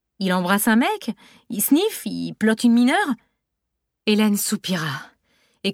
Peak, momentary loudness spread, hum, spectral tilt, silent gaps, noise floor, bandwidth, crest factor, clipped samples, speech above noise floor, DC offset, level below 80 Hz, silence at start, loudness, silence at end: -6 dBFS; 13 LU; none; -4 dB/octave; none; -79 dBFS; 17.5 kHz; 16 dB; under 0.1%; 59 dB; under 0.1%; -66 dBFS; 0.2 s; -20 LUFS; 0 s